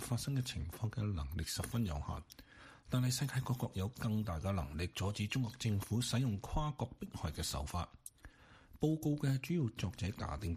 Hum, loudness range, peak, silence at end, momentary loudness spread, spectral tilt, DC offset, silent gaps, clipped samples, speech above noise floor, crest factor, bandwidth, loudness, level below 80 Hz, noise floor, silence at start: none; 2 LU; -22 dBFS; 0 s; 8 LU; -5.5 dB/octave; under 0.1%; none; under 0.1%; 23 dB; 18 dB; 15 kHz; -39 LUFS; -50 dBFS; -61 dBFS; 0 s